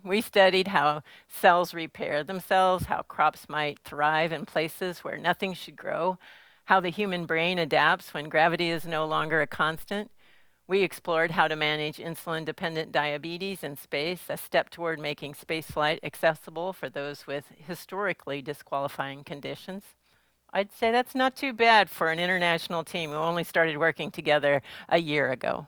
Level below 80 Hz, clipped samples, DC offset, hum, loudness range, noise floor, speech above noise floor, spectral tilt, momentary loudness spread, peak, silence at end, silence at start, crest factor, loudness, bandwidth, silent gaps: -62 dBFS; under 0.1%; under 0.1%; none; 7 LU; -68 dBFS; 40 dB; -4.5 dB/octave; 12 LU; -6 dBFS; 0 s; 0.05 s; 22 dB; -27 LUFS; over 20 kHz; none